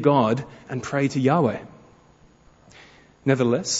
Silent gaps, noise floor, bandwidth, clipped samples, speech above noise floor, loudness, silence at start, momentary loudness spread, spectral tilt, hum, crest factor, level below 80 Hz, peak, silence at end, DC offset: none; -54 dBFS; 8 kHz; under 0.1%; 33 dB; -23 LUFS; 0 s; 12 LU; -5.5 dB/octave; none; 20 dB; -60 dBFS; -4 dBFS; 0 s; under 0.1%